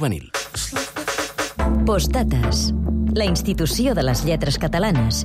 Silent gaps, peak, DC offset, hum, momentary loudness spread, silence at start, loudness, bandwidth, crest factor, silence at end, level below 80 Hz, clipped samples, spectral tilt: none; -10 dBFS; under 0.1%; none; 6 LU; 0 s; -21 LUFS; 16 kHz; 10 dB; 0 s; -26 dBFS; under 0.1%; -5 dB/octave